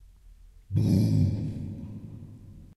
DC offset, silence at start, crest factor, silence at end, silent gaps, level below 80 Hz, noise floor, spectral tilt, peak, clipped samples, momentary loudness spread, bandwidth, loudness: under 0.1%; 0.25 s; 16 dB; 0.1 s; none; -50 dBFS; -52 dBFS; -9 dB/octave; -12 dBFS; under 0.1%; 22 LU; 12 kHz; -27 LUFS